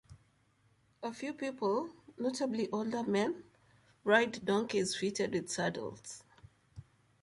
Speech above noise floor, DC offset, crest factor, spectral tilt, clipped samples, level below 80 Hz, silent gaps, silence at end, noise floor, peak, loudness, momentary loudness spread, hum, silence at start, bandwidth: 37 dB; under 0.1%; 24 dB; -4 dB/octave; under 0.1%; -70 dBFS; none; 0.4 s; -71 dBFS; -12 dBFS; -35 LUFS; 15 LU; none; 0.1 s; 11.5 kHz